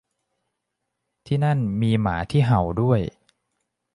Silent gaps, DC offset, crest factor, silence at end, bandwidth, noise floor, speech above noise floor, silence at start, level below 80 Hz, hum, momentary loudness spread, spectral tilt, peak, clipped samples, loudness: none; under 0.1%; 18 dB; 0.85 s; 11 kHz; -80 dBFS; 59 dB; 1.3 s; -44 dBFS; none; 4 LU; -8.5 dB/octave; -6 dBFS; under 0.1%; -22 LUFS